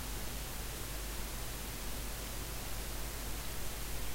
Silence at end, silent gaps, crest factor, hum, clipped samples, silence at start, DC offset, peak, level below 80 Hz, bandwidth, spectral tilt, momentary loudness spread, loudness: 0 s; none; 14 dB; none; under 0.1%; 0 s; under 0.1%; -26 dBFS; -44 dBFS; 16 kHz; -3 dB/octave; 0 LU; -42 LUFS